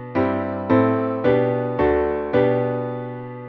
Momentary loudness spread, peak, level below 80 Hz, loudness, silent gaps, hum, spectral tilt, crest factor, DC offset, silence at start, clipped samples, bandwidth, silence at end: 8 LU; -6 dBFS; -44 dBFS; -20 LUFS; none; none; -10 dB/octave; 16 dB; under 0.1%; 0 s; under 0.1%; 5.6 kHz; 0 s